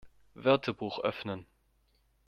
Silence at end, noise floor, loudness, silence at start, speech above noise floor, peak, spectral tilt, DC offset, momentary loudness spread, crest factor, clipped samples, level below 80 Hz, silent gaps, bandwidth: 0.85 s; -71 dBFS; -32 LUFS; 0.05 s; 40 dB; -10 dBFS; -7 dB/octave; under 0.1%; 12 LU; 24 dB; under 0.1%; -68 dBFS; none; 6.6 kHz